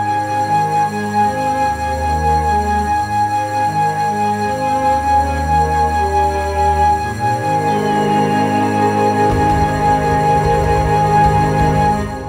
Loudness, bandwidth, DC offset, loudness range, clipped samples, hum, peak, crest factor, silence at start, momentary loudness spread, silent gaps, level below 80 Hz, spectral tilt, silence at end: -15 LUFS; 16 kHz; 0.2%; 2 LU; under 0.1%; none; -2 dBFS; 14 dB; 0 s; 3 LU; none; -28 dBFS; -6 dB/octave; 0 s